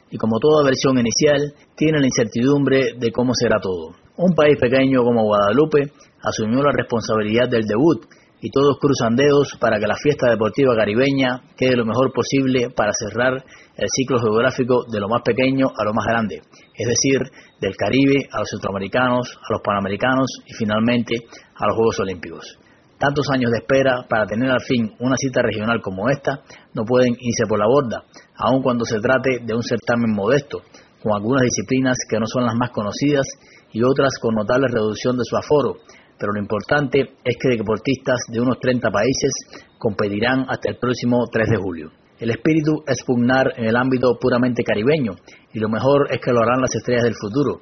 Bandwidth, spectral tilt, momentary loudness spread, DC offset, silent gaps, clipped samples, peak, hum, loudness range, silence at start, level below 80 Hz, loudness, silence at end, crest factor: 6.6 kHz; -5 dB/octave; 9 LU; under 0.1%; none; under 0.1%; -2 dBFS; none; 3 LU; 0.1 s; -50 dBFS; -19 LUFS; 0.05 s; 16 dB